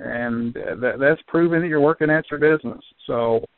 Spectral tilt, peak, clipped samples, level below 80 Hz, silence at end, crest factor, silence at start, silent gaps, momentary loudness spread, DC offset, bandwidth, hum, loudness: -6 dB/octave; -4 dBFS; under 0.1%; -56 dBFS; 0.15 s; 16 dB; 0 s; none; 9 LU; under 0.1%; 4.3 kHz; none; -20 LUFS